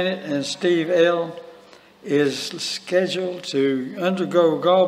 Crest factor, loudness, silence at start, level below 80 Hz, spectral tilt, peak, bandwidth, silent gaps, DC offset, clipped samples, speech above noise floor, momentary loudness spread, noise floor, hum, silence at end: 16 dB; -21 LUFS; 0 s; -74 dBFS; -5 dB/octave; -4 dBFS; 14.5 kHz; none; under 0.1%; under 0.1%; 28 dB; 8 LU; -48 dBFS; none; 0 s